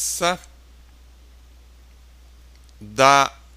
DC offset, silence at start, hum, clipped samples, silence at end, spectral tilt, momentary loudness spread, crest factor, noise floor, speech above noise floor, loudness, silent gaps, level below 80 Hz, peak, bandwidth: under 0.1%; 0 s; none; under 0.1%; 0.25 s; -2.5 dB/octave; 17 LU; 24 dB; -48 dBFS; 29 dB; -18 LUFS; none; -48 dBFS; 0 dBFS; 15.5 kHz